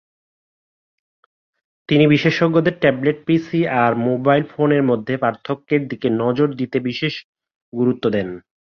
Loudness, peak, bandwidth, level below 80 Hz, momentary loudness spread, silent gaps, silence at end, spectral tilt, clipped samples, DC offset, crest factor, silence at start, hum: -18 LUFS; -2 dBFS; 6.6 kHz; -58 dBFS; 8 LU; 7.24-7.33 s, 7.56-7.72 s; 0.25 s; -8 dB/octave; under 0.1%; under 0.1%; 18 dB; 1.9 s; none